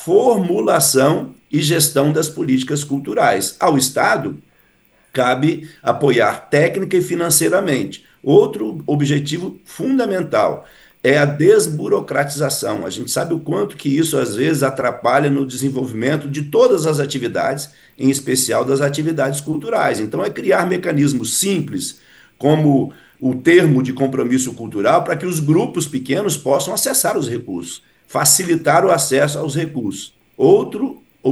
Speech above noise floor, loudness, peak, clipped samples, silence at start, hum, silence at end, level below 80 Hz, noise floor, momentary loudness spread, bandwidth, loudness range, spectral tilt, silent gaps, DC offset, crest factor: 39 dB; -17 LUFS; 0 dBFS; under 0.1%; 0 s; none; 0 s; -60 dBFS; -55 dBFS; 10 LU; 13.5 kHz; 2 LU; -4.5 dB/octave; none; under 0.1%; 16 dB